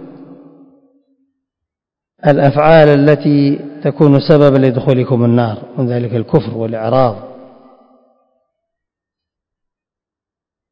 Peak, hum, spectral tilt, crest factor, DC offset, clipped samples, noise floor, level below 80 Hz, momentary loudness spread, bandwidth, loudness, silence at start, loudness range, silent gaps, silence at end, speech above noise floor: 0 dBFS; none; -10 dB/octave; 14 dB; under 0.1%; 0.5%; -87 dBFS; -48 dBFS; 11 LU; 5.4 kHz; -12 LUFS; 0 s; 9 LU; none; 3.4 s; 76 dB